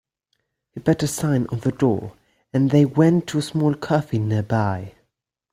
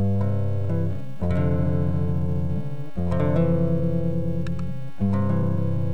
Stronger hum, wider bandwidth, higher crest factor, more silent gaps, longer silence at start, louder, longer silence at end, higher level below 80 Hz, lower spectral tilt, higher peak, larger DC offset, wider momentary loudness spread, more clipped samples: neither; first, 15 kHz vs 5.6 kHz; first, 18 dB vs 12 dB; neither; first, 0.75 s vs 0 s; first, -21 LUFS vs -25 LUFS; first, 0.65 s vs 0 s; second, -54 dBFS vs -40 dBFS; second, -7 dB/octave vs -10.5 dB/octave; first, -4 dBFS vs -10 dBFS; second, under 0.1% vs 5%; about the same, 10 LU vs 8 LU; neither